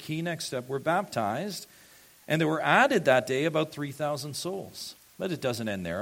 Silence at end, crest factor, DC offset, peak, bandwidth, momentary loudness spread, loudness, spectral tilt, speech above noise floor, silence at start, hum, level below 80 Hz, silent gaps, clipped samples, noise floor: 0 s; 22 dB; under 0.1%; -6 dBFS; 16.5 kHz; 15 LU; -28 LUFS; -4.5 dB/octave; 27 dB; 0 s; none; -68 dBFS; none; under 0.1%; -55 dBFS